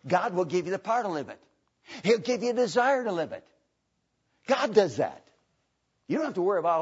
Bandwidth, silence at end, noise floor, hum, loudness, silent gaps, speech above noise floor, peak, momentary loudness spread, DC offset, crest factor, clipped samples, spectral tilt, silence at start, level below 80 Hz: 8 kHz; 0 s; -77 dBFS; none; -27 LUFS; none; 50 dB; -8 dBFS; 12 LU; under 0.1%; 20 dB; under 0.1%; -5 dB/octave; 0.05 s; -76 dBFS